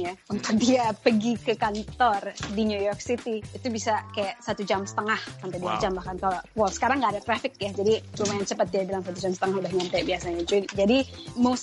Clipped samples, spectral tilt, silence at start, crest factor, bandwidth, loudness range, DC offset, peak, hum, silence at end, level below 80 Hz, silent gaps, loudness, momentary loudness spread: under 0.1%; -4.5 dB/octave; 0 s; 20 dB; 11.5 kHz; 3 LU; under 0.1%; -6 dBFS; none; 0 s; -52 dBFS; none; -27 LUFS; 8 LU